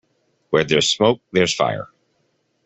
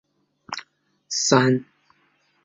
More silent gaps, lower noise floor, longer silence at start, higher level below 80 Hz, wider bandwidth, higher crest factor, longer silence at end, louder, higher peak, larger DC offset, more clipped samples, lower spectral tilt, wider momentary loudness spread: neither; about the same, -67 dBFS vs -65 dBFS; about the same, 0.5 s vs 0.5 s; first, -56 dBFS vs -64 dBFS; about the same, 8.4 kHz vs 8 kHz; about the same, 18 dB vs 22 dB; about the same, 0.8 s vs 0.8 s; about the same, -18 LUFS vs -20 LUFS; about the same, -2 dBFS vs -2 dBFS; neither; neither; about the same, -3.5 dB/octave vs -4 dB/octave; second, 10 LU vs 18 LU